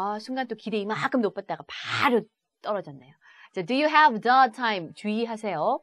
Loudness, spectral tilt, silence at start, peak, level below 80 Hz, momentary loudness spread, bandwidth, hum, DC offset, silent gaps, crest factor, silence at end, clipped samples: -25 LUFS; -5 dB/octave; 0 s; -4 dBFS; -78 dBFS; 16 LU; 13 kHz; none; under 0.1%; none; 20 dB; 0.05 s; under 0.1%